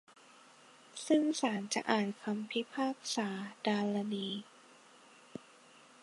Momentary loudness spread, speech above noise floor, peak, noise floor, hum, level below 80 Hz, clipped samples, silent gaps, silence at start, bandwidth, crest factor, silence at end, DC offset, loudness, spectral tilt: 20 LU; 26 dB; -12 dBFS; -60 dBFS; none; -86 dBFS; under 0.1%; none; 0.95 s; 11.5 kHz; 24 dB; 0.65 s; under 0.1%; -35 LUFS; -4 dB/octave